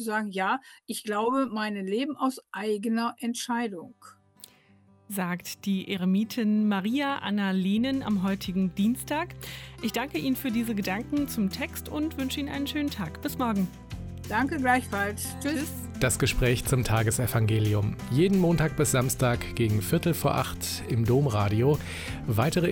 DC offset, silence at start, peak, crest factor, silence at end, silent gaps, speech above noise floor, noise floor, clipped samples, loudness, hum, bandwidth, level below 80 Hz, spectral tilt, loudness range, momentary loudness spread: under 0.1%; 0 s; -10 dBFS; 18 dB; 0 s; none; 32 dB; -59 dBFS; under 0.1%; -28 LUFS; none; 17.5 kHz; -46 dBFS; -5.5 dB/octave; 6 LU; 8 LU